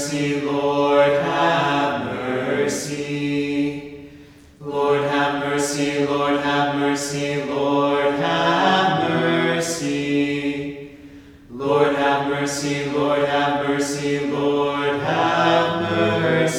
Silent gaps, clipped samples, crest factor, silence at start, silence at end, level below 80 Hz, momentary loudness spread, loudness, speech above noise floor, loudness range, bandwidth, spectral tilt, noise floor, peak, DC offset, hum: none; under 0.1%; 16 dB; 0 s; 0 s; -54 dBFS; 8 LU; -20 LUFS; 25 dB; 4 LU; 16 kHz; -4.5 dB/octave; -45 dBFS; -4 dBFS; under 0.1%; none